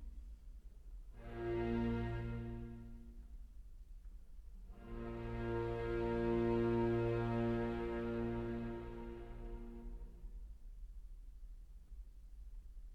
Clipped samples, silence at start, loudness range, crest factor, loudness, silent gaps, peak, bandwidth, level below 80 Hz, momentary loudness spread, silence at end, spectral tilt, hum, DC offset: under 0.1%; 0 s; 16 LU; 16 dB; -41 LUFS; none; -26 dBFS; 7.4 kHz; -50 dBFS; 23 LU; 0 s; -9 dB/octave; none; under 0.1%